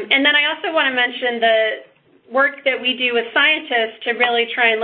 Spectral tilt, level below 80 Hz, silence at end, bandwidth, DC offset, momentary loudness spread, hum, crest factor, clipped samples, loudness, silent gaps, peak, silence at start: -6.5 dB/octave; -66 dBFS; 0 s; 4.6 kHz; under 0.1%; 6 LU; none; 18 dB; under 0.1%; -16 LUFS; none; 0 dBFS; 0 s